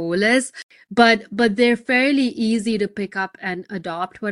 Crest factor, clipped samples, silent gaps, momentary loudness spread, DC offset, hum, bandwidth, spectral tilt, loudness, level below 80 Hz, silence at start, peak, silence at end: 18 dB; under 0.1%; 0.63-0.69 s; 13 LU; under 0.1%; none; 11.5 kHz; -4.5 dB/octave; -19 LUFS; -60 dBFS; 0 s; -2 dBFS; 0 s